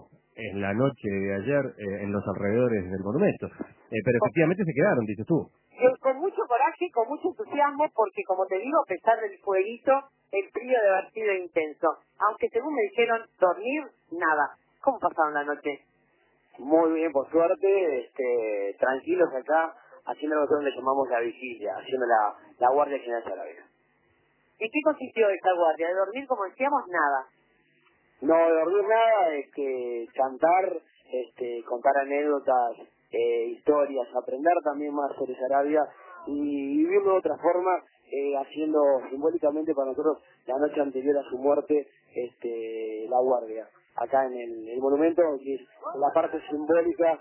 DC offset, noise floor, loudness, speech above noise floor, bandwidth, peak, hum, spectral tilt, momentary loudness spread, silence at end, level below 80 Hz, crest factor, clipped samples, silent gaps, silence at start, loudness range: under 0.1%; -67 dBFS; -26 LUFS; 41 dB; 3.2 kHz; -8 dBFS; none; -10 dB/octave; 11 LU; 0 s; -66 dBFS; 18 dB; under 0.1%; none; 0.35 s; 3 LU